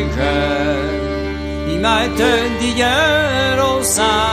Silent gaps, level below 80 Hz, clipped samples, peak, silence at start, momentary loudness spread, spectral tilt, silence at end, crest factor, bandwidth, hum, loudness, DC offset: none; -28 dBFS; under 0.1%; -2 dBFS; 0 s; 8 LU; -3.5 dB/octave; 0 s; 14 dB; 15.5 kHz; 50 Hz at -45 dBFS; -16 LUFS; under 0.1%